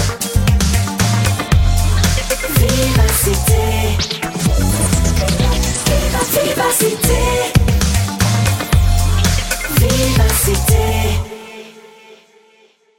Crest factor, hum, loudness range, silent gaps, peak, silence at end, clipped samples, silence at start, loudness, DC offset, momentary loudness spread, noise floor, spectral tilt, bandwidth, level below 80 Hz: 14 dB; none; 1 LU; none; 0 dBFS; 1.2 s; under 0.1%; 0 s; -15 LUFS; under 0.1%; 4 LU; -52 dBFS; -4.5 dB/octave; 17 kHz; -20 dBFS